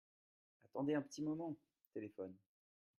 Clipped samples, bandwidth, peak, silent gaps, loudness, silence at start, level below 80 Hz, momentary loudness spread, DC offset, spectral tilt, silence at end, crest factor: under 0.1%; 13.5 kHz; -28 dBFS; 1.87-1.91 s; -46 LUFS; 0.75 s; -88 dBFS; 13 LU; under 0.1%; -6.5 dB/octave; 0.65 s; 18 dB